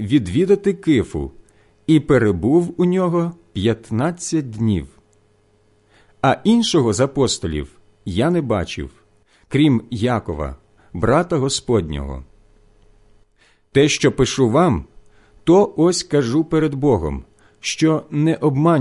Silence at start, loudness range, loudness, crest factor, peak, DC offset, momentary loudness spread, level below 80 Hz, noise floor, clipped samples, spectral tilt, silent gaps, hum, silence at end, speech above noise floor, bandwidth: 0 s; 4 LU; -18 LUFS; 16 dB; -4 dBFS; under 0.1%; 13 LU; -38 dBFS; -57 dBFS; under 0.1%; -6 dB/octave; none; none; 0 s; 40 dB; 11.5 kHz